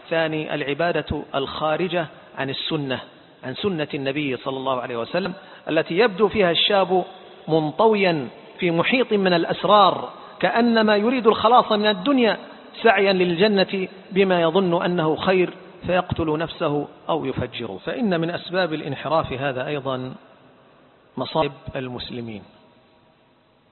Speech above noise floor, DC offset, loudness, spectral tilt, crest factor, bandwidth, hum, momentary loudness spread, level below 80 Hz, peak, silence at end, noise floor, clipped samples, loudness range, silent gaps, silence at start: 37 dB; under 0.1%; -21 LUFS; -10.5 dB/octave; 20 dB; 4.4 kHz; none; 13 LU; -52 dBFS; -2 dBFS; 1.25 s; -58 dBFS; under 0.1%; 9 LU; none; 0.05 s